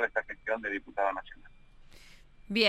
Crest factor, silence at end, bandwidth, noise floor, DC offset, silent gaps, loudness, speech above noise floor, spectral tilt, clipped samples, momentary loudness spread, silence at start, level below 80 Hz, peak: 24 dB; 0 s; 16 kHz; -54 dBFS; under 0.1%; none; -34 LUFS; 20 dB; -4 dB/octave; under 0.1%; 23 LU; 0 s; -58 dBFS; -10 dBFS